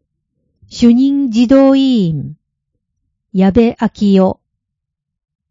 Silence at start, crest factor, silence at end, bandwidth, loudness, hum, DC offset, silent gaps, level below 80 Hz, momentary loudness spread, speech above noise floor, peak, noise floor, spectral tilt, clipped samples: 0.75 s; 14 dB; 1.2 s; 7.6 kHz; -12 LUFS; none; under 0.1%; none; -42 dBFS; 14 LU; 67 dB; 0 dBFS; -77 dBFS; -7.5 dB/octave; 0.2%